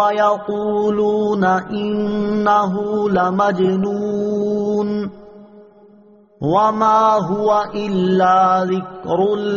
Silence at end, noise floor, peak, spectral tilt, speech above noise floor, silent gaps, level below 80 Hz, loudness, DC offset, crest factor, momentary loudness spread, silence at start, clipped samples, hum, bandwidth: 0 s; -48 dBFS; -4 dBFS; -5.5 dB/octave; 31 dB; none; -52 dBFS; -17 LUFS; under 0.1%; 14 dB; 7 LU; 0 s; under 0.1%; none; 7.2 kHz